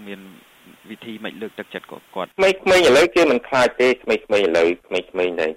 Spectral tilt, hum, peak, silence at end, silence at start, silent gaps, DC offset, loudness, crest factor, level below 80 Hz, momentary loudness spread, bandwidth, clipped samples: -3.5 dB/octave; none; -8 dBFS; 0 s; 0 s; none; under 0.1%; -17 LUFS; 12 dB; -54 dBFS; 20 LU; 16 kHz; under 0.1%